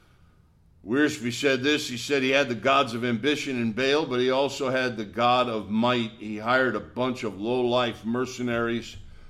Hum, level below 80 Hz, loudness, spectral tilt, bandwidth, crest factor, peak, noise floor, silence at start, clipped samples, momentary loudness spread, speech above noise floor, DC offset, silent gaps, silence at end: none; -56 dBFS; -25 LUFS; -4.5 dB/octave; 14.5 kHz; 16 dB; -8 dBFS; -58 dBFS; 0.85 s; under 0.1%; 7 LU; 33 dB; under 0.1%; none; 0 s